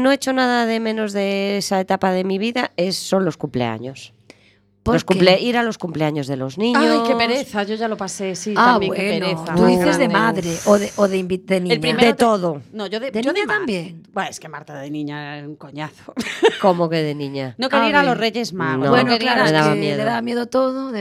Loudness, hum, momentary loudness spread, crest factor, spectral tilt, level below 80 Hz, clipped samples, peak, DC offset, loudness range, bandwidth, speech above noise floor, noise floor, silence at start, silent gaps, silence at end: -18 LUFS; none; 13 LU; 18 dB; -5 dB/octave; -50 dBFS; under 0.1%; 0 dBFS; under 0.1%; 5 LU; 15.5 kHz; 37 dB; -55 dBFS; 0 s; none; 0 s